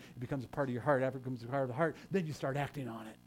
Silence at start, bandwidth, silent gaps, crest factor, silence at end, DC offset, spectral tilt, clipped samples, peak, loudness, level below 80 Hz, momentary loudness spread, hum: 0 s; 16.5 kHz; none; 20 dB; 0.1 s; under 0.1%; -7.5 dB/octave; under 0.1%; -16 dBFS; -37 LUFS; -66 dBFS; 9 LU; none